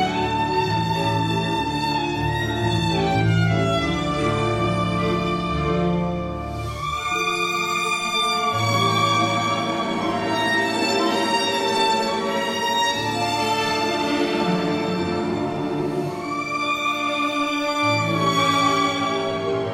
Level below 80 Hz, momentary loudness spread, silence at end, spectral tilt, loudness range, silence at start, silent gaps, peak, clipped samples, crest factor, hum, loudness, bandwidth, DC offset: -42 dBFS; 5 LU; 0 s; -5 dB/octave; 3 LU; 0 s; none; -6 dBFS; under 0.1%; 14 dB; none; -21 LUFS; 16 kHz; under 0.1%